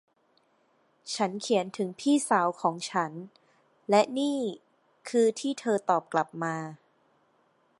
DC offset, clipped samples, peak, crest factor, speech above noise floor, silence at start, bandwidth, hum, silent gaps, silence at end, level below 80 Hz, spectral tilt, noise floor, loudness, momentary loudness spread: under 0.1%; under 0.1%; -10 dBFS; 20 dB; 41 dB; 1.05 s; 11.5 kHz; none; none; 1.05 s; -84 dBFS; -4.5 dB/octave; -69 dBFS; -28 LUFS; 19 LU